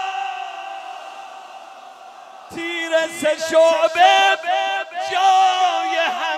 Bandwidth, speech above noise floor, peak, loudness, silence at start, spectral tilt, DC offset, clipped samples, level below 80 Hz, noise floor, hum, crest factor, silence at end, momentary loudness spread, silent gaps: 13.5 kHz; 24 dB; -2 dBFS; -17 LUFS; 0 s; -1 dB/octave; under 0.1%; under 0.1%; -72 dBFS; -40 dBFS; none; 18 dB; 0 s; 21 LU; none